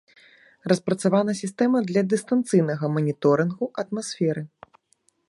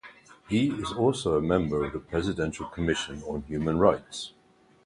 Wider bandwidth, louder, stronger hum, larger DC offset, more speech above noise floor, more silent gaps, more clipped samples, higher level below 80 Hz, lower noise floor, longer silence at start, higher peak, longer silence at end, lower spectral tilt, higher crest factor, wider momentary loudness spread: about the same, 11.5 kHz vs 11.5 kHz; first, -23 LUFS vs -28 LUFS; neither; neither; first, 44 dB vs 24 dB; neither; neither; second, -70 dBFS vs -46 dBFS; first, -67 dBFS vs -51 dBFS; first, 0.65 s vs 0.05 s; about the same, -6 dBFS vs -6 dBFS; first, 0.8 s vs 0.55 s; about the same, -6.5 dB/octave vs -6 dB/octave; about the same, 18 dB vs 22 dB; about the same, 8 LU vs 10 LU